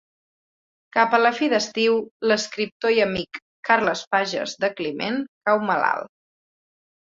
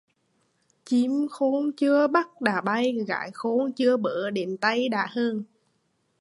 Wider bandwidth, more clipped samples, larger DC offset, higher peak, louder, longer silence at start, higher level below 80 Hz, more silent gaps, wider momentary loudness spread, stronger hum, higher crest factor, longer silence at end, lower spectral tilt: second, 7.8 kHz vs 11.5 kHz; neither; neither; first, -2 dBFS vs -6 dBFS; first, -22 LUFS vs -25 LUFS; about the same, 0.95 s vs 0.85 s; first, -62 dBFS vs -78 dBFS; first, 2.11-2.20 s, 2.72-2.80 s, 3.42-3.63 s, 4.07-4.11 s, 5.28-5.41 s vs none; about the same, 8 LU vs 7 LU; neither; about the same, 20 dB vs 20 dB; first, 1 s vs 0.75 s; second, -3.5 dB/octave vs -5.5 dB/octave